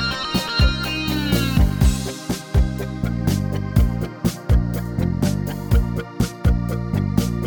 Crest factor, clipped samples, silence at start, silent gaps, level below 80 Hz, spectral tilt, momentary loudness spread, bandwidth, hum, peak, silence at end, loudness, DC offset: 16 dB; under 0.1%; 0 s; none; -24 dBFS; -6 dB/octave; 6 LU; over 20 kHz; none; -4 dBFS; 0 s; -21 LUFS; under 0.1%